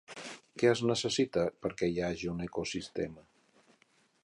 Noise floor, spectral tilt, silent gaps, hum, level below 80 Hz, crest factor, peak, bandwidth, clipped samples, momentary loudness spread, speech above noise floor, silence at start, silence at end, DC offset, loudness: -69 dBFS; -5 dB/octave; none; none; -60 dBFS; 20 dB; -14 dBFS; 11 kHz; under 0.1%; 12 LU; 37 dB; 0.1 s; 1.05 s; under 0.1%; -33 LUFS